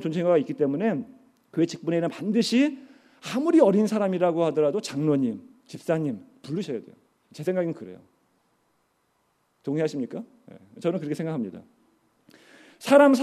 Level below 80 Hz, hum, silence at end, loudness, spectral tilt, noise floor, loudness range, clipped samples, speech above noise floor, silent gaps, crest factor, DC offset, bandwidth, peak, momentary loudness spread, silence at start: -76 dBFS; none; 0 s; -25 LUFS; -6.5 dB/octave; -70 dBFS; 11 LU; under 0.1%; 46 dB; none; 22 dB; under 0.1%; 14 kHz; -4 dBFS; 19 LU; 0 s